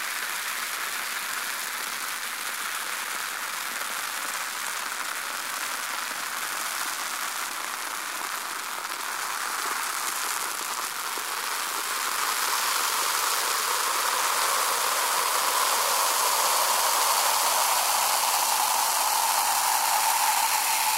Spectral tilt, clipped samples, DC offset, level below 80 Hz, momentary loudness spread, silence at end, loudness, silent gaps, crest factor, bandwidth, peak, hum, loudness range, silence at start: 2.5 dB/octave; under 0.1%; under 0.1%; -78 dBFS; 8 LU; 0 s; -25 LUFS; none; 18 dB; 16.5 kHz; -8 dBFS; none; 7 LU; 0 s